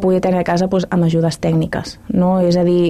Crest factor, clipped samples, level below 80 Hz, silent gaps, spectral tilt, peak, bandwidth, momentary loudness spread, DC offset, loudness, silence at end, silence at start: 8 dB; under 0.1%; -42 dBFS; none; -7.5 dB/octave; -6 dBFS; 11.5 kHz; 6 LU; under 0.1%; -16 LUFS; 0 s; 0 s